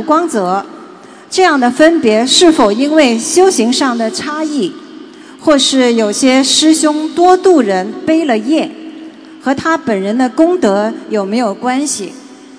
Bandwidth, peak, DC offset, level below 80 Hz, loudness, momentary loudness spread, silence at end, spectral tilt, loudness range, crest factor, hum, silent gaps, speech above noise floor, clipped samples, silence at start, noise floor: 11 kHz; 0 dBFS; under 0.1%; -52 dBFS; -11 LUFS; 10 LU; 0 s; -3 dB/octave; 4 LU; 12 dB; none; none; 24 dB; 0.7%; 0 s; -35 dBFS